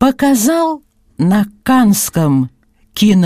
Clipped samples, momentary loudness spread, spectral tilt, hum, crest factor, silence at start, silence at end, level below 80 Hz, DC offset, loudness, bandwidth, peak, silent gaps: under 0.1%; 10 LU; -5.5 dB/octave; none; 12 dB; 0 s; 0 s; -46 dBFS; under 0.1%; -13 LUFS; 15.5 kHz; 0 dBFS; none